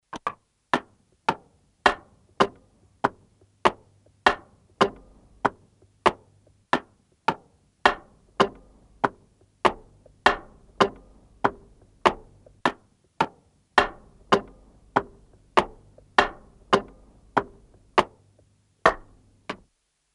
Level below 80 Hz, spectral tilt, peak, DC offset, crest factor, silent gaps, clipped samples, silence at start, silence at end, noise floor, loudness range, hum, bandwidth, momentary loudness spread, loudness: -52 dBFS; -4 dB/octave; -2 dBFS; under 0.1%; 26 dB; none; under 0.1%; 0.15 s; 0.6 s; -71 dBFS; 2 LU; none; 11.5 kHz; 15 LU; -26 LUFS